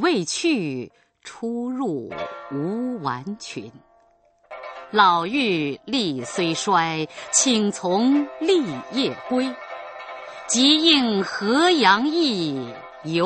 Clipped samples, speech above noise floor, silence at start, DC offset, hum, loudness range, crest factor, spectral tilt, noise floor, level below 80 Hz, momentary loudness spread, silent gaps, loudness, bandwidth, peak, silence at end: under 0.1%; 38 dB; 0 s; under 0.1%; none; 10 LU; 20 dB; -3 dB/octave; -59 dBFS; -66 dBFS; 19 LU; none; -21 LUFS; 8.8 kHz; -2 dBFS; 0 s